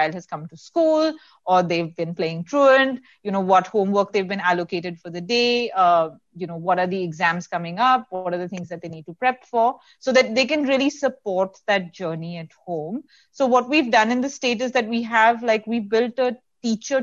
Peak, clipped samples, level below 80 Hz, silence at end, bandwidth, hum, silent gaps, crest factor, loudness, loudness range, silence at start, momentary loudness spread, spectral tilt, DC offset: -4 dBFS; under 0.1%; -68 dBFS; 0 s; 7.6 kHz; none; none; 18 dB; -21 LUFS; 3 LU; 0 s; 14 LU; -4.5 dB/octave; under 0.1%